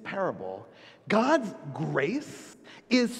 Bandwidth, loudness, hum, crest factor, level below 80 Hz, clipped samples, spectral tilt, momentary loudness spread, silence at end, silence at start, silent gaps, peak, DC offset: 13.5 kHz; -29 LUFS; none; 20 dB; -72 dBFS; under 0.1%; -5.5 dB/octave; 19 LU; 0 s; 0 s; none; -10 dBFS; under 0.1%